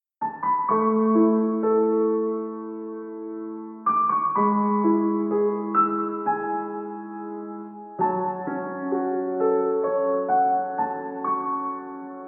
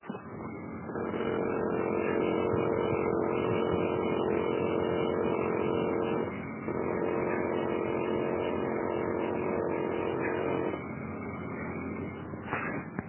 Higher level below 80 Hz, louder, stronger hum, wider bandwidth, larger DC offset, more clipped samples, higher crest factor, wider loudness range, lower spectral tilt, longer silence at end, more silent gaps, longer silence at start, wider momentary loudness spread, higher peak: second, -80 dBFS vs -54 dBFS; first, -24 LUFS vs -32 LUFS; neither; second, 2.8 kHz vs 3.2 kHz; neither; neither; about the same, 14 dB vs 16 dB; about the same, 4 LU vs 4 LU; first, -13.5 dB/octave vs -6 dB/octave; about the same, 0 s vs 0 s; neither; first, 0.2 s vs 0.05 s; first, 13 LU vs 9 LU; first, -10 dBFS vs -16 dBFS